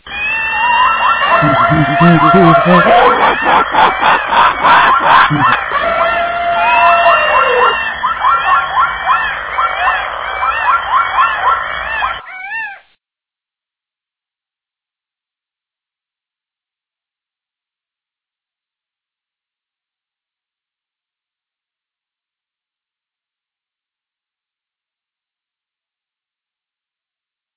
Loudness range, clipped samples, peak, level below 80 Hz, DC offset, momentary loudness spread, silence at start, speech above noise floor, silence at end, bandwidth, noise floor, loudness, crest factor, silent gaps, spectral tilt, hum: 11 LU; 0.2%; 0 dBFS; -42 dBFS; under 0.1%; 9 LU; 0.05 s; 80 dB; 14.8 s; 4 kHz; -88 dBFS; -10 LUFS; 14 dB; none; -9 dB/octave; none